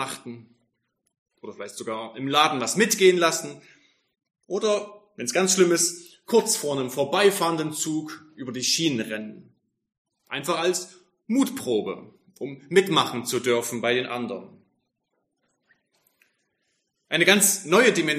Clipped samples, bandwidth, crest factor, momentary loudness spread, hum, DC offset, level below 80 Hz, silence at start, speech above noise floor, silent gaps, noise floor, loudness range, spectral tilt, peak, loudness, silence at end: under 0.1%; 15.5 kHz; 22 dB; 19 LU; none; under 0.1%; -76 dBFS; 0 s; 53 dB; 1.18-1.26 s, 9.98-10.05 s; -77 dBFS; 6 LU; -3 dB/octave; -2 dBFS; -23 LUFS; 0 s